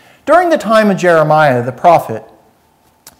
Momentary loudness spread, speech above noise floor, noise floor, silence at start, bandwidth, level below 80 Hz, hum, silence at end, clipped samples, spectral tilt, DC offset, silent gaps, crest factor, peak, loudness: 4 LU; 42 dB; -52 dBFS; 0.25 s; 16 kHz; -54 dBFS; none; 0.1 s; under 0.1%; -6 dB/octave; under 0.1%; none; 12 dB; 0 dBFS; -10 LUFS